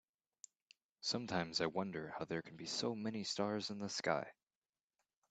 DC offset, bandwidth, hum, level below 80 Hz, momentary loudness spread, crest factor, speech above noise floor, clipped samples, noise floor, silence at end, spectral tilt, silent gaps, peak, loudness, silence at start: under 0.1%; 9 kHz; none; -80 dBFS; 15 LU; 24 dB; over 49 dB; under 0.1%; under -90 dBFS; 1 s; -4 dB/octave; none; -20 dBFS; -41 LUFS; 1 s